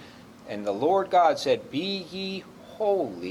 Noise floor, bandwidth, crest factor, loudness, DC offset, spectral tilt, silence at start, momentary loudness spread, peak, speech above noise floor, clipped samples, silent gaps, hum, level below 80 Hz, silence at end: -46 dBFS; 14.5 kHz; 18 dB; -26 LUFS; under 0.1%; -5 dB/octave; 0 s; 14 LU; -8 dBFS; 21 dB; under 0.1%; none; none; -68 dBFS; 0 s